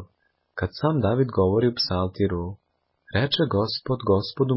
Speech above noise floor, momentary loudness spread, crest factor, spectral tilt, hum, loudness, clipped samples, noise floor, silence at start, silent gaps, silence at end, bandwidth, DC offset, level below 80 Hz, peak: 47 dB; 10 LU; 16 dB; -10 dB/octave; none; -24 LUFS; under 0.1%; -69 dBFS; 0 s; none; 0 s; 5.8 kHz; under 0.1%; -42 dBFS; -8 dBFS